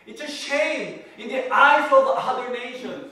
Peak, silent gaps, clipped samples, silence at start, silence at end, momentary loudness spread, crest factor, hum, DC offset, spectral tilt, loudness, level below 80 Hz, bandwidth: -2 dBFS; none; under 0.1%; 0.05 s; 0 s; 18 LU; 18 dB; none; under 0.1%; -2.5 dB/octave; -20 LUFS; -74 dBFS; 12.5 kHz